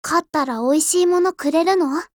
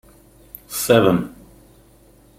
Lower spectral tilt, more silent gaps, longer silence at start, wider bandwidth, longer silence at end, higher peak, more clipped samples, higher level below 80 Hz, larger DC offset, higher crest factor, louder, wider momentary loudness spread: second, -2 dB/octave vs -5 dB/octave; neither; second, 0.05 s vs 0.7 s; first, 20 kHz vs 16.5 kHz; second, 0.1 s vs 1.1 s; about the same, -4 dBFS vs -2 dBFS; neither; second, -62 dBFS vs -50 dBFS; neither; second, 14 dB vs 20 dB; about the same, -18 LUFS vs -18 LUFS; second, 4 LU vs 26 LU